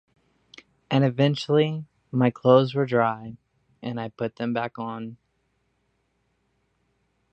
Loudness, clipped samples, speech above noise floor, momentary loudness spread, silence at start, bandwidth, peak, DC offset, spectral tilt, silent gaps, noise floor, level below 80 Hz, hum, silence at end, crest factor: -24 LUFS; under 0.1%; 49 dB; 18 LU; 0.9 s; 8.4 kHz; -2 dBFS; under 0.1%; -8 dB/octave; none; -72 dBFS; -68 dBFS; none; 2.2 s; 24 dB